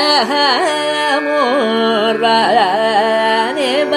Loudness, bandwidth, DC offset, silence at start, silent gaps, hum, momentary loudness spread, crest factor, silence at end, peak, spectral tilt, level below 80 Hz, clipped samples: -13 LUFS; 15.5 kHz; under 0.1%; 0 s; none; none; 3 LU; 12 dB; 0 s; 0 dBFS; -3 dB/octave; -66 dBFS; under 0.1%